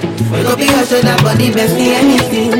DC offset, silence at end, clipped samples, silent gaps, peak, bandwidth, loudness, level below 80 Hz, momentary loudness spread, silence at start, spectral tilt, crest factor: under 0.1%; 0 s; under 0.1%; none; 0 dBFS; 17 kHz; -11 LUFS; -40 dBFS; 3 LU; 0 s; -5 dB/octave; 10 dB